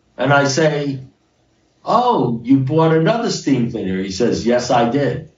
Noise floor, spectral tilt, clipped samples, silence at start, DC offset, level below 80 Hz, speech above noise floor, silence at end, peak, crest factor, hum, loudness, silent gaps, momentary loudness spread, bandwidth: -59 dBFS; -6 dB/octave; under 0.1%; 0.2 s; under 0.1%; -52 dBFS; 43 dB; 0.1 s; -2 dBFS; 14 dB; none; -16 LUFS; none; 8 LU; 7.6 kHz